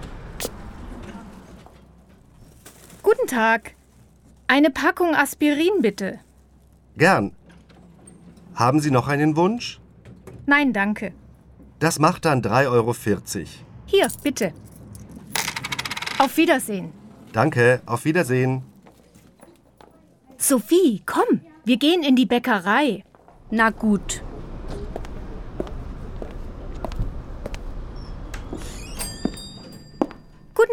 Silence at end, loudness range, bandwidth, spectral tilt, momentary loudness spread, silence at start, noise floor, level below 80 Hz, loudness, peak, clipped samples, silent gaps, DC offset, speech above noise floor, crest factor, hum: 0 s; 13 LU; 19 kHz; -5 dB/octave; 20 LU; 0 s; -53 dBFS; -40 dBFS; -21 LUFS; -2 dBFS; under 0.1%; none; under 0.1%; 33 dB; 20 dB; none